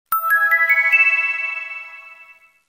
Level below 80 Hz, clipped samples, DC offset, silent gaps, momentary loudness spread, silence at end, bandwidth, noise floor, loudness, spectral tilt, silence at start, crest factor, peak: -72 dBFS; under 0.1%; under 0.1%; none; 18 LU; 0.45 s; 16.5 kHz; -48 dBFS; -15 LUFS; 2 dB/octave; 0.1 s; 16 dB; -4 dBFS